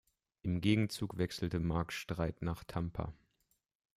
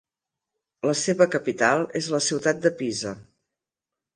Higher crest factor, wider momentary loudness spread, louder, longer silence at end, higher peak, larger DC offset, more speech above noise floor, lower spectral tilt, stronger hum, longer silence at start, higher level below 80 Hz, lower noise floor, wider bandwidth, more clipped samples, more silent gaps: about the same, 18 dB vs 22 dB; about the same, 9 LU vs 9 LU; second, -37 LUFS vs -23 LUFS; about the same, 0.85 s vs 0.95 s; second, -18 dBFS vs -4 dBFS; neither; second, 44 dB vs 65 dB; first, -6.5 dB/octave vs -3.5 dB/octave; neither; second, 0.45 s vs 0.85 s; first, -56 dBFS vs -68 dBFS; second, -80 dBFS vs -88 dBFS; first, 15.5 kHz vs 10.5 kHz; neither; neither